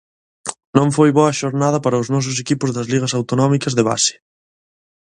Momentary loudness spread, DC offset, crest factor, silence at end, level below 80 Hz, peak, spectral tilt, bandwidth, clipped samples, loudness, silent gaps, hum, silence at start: 6 LU; under 0.1%; 18 dB; 0.9 s; -56 dBFS; 0 dBFS; -5 dB/octave; 11 kHz; under 0.1%; -17 LUFS; 0.65-0.73 s; none; 0.45 s